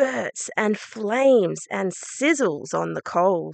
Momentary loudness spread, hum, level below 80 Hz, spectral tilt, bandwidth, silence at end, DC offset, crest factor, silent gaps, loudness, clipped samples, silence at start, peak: 9 LU; none; -76 dBFS; -4.5 dB/octave; 9.2 kHz; 0 s; under 0.1%; 16 dB; none; -23 LUFS; under 0.1%; 0 s; -6 dBFS